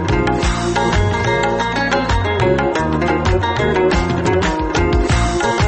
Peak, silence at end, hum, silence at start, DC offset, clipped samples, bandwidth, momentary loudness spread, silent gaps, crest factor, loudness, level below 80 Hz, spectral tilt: -4 dBFS; 0 s; none; 0 s; under 0.1%; under 0.1%; 8.8 kHz; 2 LU; none; 12 dB; -16 LUFS; -24 dBFS; -5.5 dB/octave